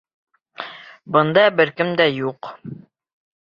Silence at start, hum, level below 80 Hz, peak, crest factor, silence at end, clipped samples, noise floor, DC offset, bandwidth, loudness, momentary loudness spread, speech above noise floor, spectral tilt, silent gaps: 0.6 s; none; -64 dBFS; -2 dBFS; 20 dB; 0.65 s; under 0.1%; -37 dBFS; under 0.1%; 6.8 kHz; -17 LUFS; 22 LU; 20 dB; -7.5 dB/octave; none